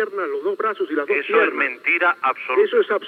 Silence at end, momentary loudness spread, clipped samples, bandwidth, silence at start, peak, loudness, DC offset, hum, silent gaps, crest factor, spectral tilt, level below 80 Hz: 0 s; 7 LU; under 0.1%; 4.7 kHz; 0 s; -4 dBFS; -20 LUFS; under 0.1%; none; none; 16 dB; -5 dB/octave; under -90 dBFS